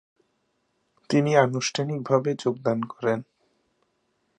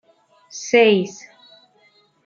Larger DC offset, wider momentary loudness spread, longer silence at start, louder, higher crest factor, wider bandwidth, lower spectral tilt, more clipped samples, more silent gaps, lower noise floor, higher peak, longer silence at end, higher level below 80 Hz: neither; second, 7 LU vs 23 LU; first, 1.1 s vs 0.55 s; second, -25 LUFS vs -17 LUFS; about the same, 24 dB vs 20 dB; first, 11 kHz vs 7.4 kHz; first, -5.5 dB/octave vs -4 dB/octave; neither; neither; first, -73 dBFS vs -58 dBFS; about the same, -4 dBFS vs -2 dBFS; about the same, 1.15 s vs 1.15 s; about the same, -72 dBFS vs -76 dBFS